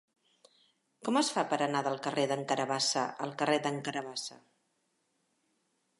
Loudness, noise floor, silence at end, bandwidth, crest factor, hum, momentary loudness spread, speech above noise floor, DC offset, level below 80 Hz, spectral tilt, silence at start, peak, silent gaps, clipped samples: -32 LUFS; -78 dBFS; 1.65 s; 11.5 kHz; 20 dB; none; 9 LU; 45 dB; under 0.1%; -86 dBFS; -3.5 dB/octave; 1 s; -16 dBFS; none; under 0.1%